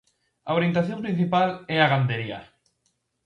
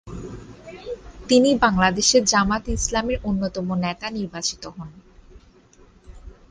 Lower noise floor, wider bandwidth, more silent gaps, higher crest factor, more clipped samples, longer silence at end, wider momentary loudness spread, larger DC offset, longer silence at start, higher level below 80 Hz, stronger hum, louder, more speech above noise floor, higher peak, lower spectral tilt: first, -73 dBFS vs -52 dBFS; second, 6.8 kHz vs 10.5 kHz; neither; about the same, 20 dB vs 20 dB; neither; first, 0.8 s vs 0.15 s; second, 13 LU vs 22 LU; neither; first, 0.45 s vs 0.05 s; second, -62 dBFS vs -40 dBFS; neither; second, -24 LUFS vs -20 LUFS; first, 50 dB vs 31 dB; about the same, -6 dBFS vs -4 dBFS; first, -8 dB/octave vs -3.5 dB/octave